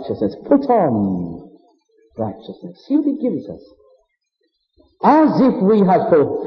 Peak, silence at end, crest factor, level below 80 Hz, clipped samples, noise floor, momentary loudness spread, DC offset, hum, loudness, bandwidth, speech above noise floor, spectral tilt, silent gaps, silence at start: -2 dBFS; 0 s; 16 dB; -56 dBFS; under 0.1%; -70 dBFS; 22 LU; under 0.1%; none; -16 LUFS; 6 kHz; 54 dB; -10 dB/octave; none; 0 s